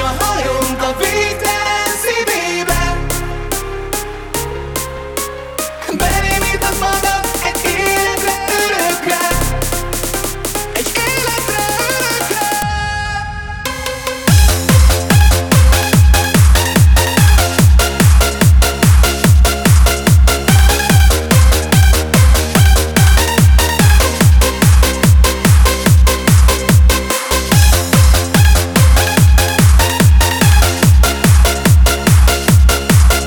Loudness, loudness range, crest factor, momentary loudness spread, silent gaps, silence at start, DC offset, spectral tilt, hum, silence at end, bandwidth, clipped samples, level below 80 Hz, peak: -12 LUFS; 6 LU; 10 dB; 10 LU; none; 0 s; 0.3%; -4.5 dB/octave; none; 0 s; over 20 kHz; under 0.1%; -14 dBFS; 0 dBFS